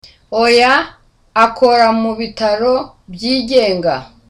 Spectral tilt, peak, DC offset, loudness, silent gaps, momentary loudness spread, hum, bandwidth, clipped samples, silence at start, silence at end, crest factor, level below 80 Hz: -4 dB/octave; 0 dBFS; under 0.1%; -13 LUFS; none; 11 LU; none; 11.5 kHz; under 0.1%; 0.3 s; 0.25 s; 14 dB; -46 dBFS